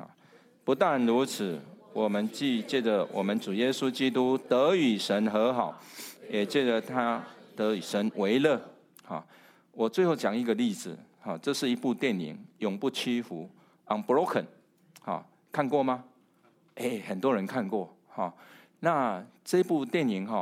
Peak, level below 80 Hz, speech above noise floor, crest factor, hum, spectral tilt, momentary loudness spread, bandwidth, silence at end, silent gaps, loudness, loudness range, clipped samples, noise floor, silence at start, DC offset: -10 dBFS; -84 dBFS; 36 dB; 20 dB; none; -5 dB/octave; 13 LU; 16 kHz; 0 s; none; -29 LUFS; 5 LU; under 0.1%; -65 dBFS; 0 s; under 0.1%